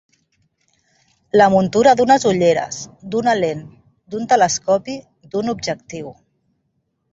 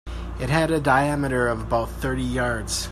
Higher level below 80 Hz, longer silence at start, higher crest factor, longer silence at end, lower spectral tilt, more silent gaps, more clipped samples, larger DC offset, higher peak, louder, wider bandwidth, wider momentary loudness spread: second, -56 dBFS vs -34 dBFS; first, 1.35 s vs 0.05 s; about the same, 18 dB vs 20 dB; first, 1 s vs 0 s; about the same, -4.5 dB/octave vs -5 dB/octave; neither; neither; neither; about the same, -2 dBFS vs -4 dBFS; first, -17 LUFS vs -23 LUFS; second, 8 kHz vs 14.5 kHz; first, 18 LU vs 7 LU